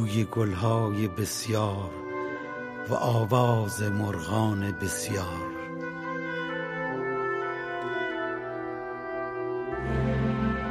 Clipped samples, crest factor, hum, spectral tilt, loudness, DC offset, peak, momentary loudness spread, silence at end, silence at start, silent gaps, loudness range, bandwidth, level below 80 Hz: under 0.1%; 18 dB; none; -6 dB/octave; -29 LUFS; under 0.1%; -10 dBFS; 9 LU; 0 s; 0 s; none; 4 LU; 15.5 kHz; -48 dBFS